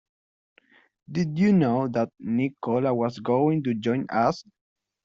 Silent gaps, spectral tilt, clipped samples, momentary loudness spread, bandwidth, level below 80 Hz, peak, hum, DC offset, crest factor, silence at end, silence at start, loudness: none; -8 dB/octave; under 0.1%; 7 LU; 7.6 kHz; -64 dBFS; -10 dBFS; none; under 0.1%; 16 dB; 0.65 s; 1.1 s; -25 LUFS